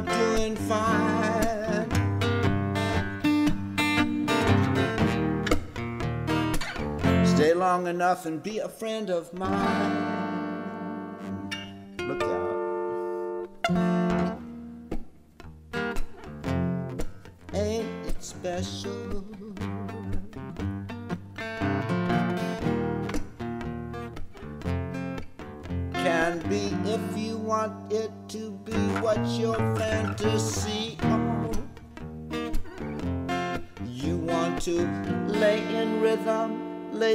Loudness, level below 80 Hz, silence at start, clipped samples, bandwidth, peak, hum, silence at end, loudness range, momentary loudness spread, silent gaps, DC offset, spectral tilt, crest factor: -28 LUFS; -42 dBFS; 0 s; under 0.1%; 16 kHz; -8 dBFS; none; 0 s; 8 LU; 13 LU; none; under 0.1%; -6 dB/octave; 18 dB